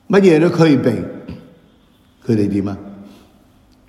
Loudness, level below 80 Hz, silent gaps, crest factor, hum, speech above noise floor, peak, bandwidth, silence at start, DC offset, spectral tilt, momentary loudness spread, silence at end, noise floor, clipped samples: -15 LUFS; -52 dBFS; none; 16 dB; none; 38 dB; 0 dBFS; 12.5 kHz; 0.1 s; under 0.1%; -7.5 dB/octave; 23 LU; 0.8 s; -52 dBFS; under 0.1%